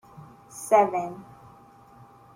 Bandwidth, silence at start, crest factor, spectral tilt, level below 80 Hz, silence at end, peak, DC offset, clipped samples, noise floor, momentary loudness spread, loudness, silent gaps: 16.5 kHz; 0.2 s; 20 dB; -5 dB/octave; -68 dBFS; 1.1 s; -8 dBFS; under 0.1%; under 0.1%; -52 dBFS; 23 LU; -24 LUFS; none